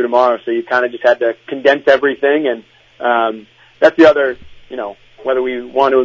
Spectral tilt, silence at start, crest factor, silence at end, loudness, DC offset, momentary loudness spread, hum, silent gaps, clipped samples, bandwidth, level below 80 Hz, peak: -5 dB/octave; 0 s; 14 dB; 0 s; -14 LUFS; under 0.1%; 16 LU; none; none; 0.1%; 7.6 kHz; -56 dBFS; 0 dBFS